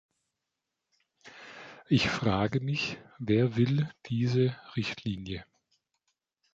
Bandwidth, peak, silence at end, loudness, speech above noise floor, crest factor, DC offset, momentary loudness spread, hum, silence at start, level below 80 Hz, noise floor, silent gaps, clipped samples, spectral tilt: 7.8 kHz; -14 dBFS; 1.1 s; -30 LUFS; 57 dB; 18 dB; under 0.1%; 19 LU; none; 1.25 s; -58 dBFS; -86 dBFS; none; under 0.1%; -6.5 dB/octave